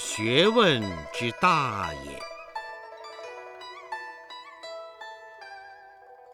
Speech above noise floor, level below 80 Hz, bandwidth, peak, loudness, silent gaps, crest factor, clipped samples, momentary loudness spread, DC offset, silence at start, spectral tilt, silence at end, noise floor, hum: 26 dB; -58 dBFS; 17 kHz; -6 dBFS; -25 LUFS; none; 22 dB; under 0.1%; 22 LU; under 0.1%; 0 s; -4 dB/octave; 0 s; -50 dBFS; none